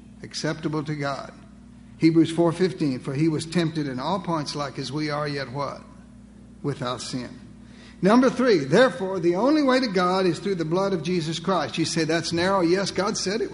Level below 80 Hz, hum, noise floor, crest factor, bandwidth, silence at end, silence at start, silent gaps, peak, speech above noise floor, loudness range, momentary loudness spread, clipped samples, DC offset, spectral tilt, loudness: -54 dBFS; none; -46 dBFS; 18 dB; 11 kHz; 0 s; 0.05 s; none; -6 dBFS; 23 dB; 8 LU; 11 LU; under 0.1%; under 0.1%; -5.5 dB/octave; -24 LUFS